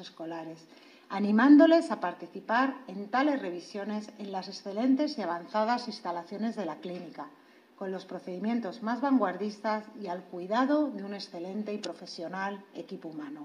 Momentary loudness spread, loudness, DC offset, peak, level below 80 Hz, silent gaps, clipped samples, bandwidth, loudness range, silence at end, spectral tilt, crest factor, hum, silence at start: 15 LU; -30 LUFS; under 0.1%; -8 dBFS; under -90 dBFS; none; under 0.1%; 9.6 kHz; 9 LU; 0 s; -6 dB/octave; 22 dB; none; 0 s